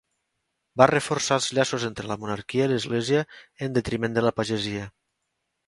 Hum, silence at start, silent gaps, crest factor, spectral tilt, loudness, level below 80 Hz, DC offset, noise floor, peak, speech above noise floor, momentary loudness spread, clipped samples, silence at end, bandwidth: none; 0.75 s; none; 26 dB; -4.5 dB/octave; -25 LUFS; -56 dBFS; under 0.1%; -79 dBFS; 0 dBFS; 54 dB; 13 LU; under 0.1%; 0.8 s; 11.5 kHz